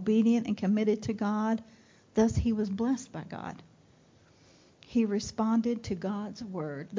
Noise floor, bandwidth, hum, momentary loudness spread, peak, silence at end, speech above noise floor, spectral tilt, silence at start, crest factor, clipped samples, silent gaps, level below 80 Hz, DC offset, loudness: -61 dBFS; 7.6 kHz; none; 13 LU; -14 dBFS; 0 s; 32 dB; -6.5 dB/octave; 0 s; 16 dB; under 0.1%; none; -50 dBFS; under 0.1%; -30 LUFS